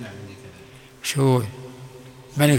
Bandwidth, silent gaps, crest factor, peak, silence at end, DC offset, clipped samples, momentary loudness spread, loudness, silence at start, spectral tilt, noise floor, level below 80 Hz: 17.5 kHz; none; 20 dB; -4 dBFS; 0 s; under 0.1%; under 0.1%; 24 LU; -23 LUFS; 0 s; -5.5 dB/octave; -45 dBFS; -60 dBFS